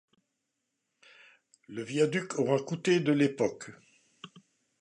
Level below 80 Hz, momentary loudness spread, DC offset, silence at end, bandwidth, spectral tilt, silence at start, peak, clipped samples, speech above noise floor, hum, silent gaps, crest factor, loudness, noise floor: -78 dBFS; 24 LU; under 0.1%; 0.4 s; 11 kHz; -5.5 dB/octave; 1.7 s; -12 dBFS; under 0.1%; 54 dB; none; none; 20 dB; -29 LUFS; -83 dBFS